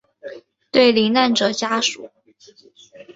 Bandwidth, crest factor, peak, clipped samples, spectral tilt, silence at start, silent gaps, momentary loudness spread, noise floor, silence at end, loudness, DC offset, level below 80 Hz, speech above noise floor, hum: 8 kHz; 18 dB; -2 dBFS; under 0.1%; -3 dB/octave; 0.25 s; none; 23 LU; -51 dBFS; 0.15 s; -17 LUFS; under 0.1%; -64 dBFS; 34 dB; none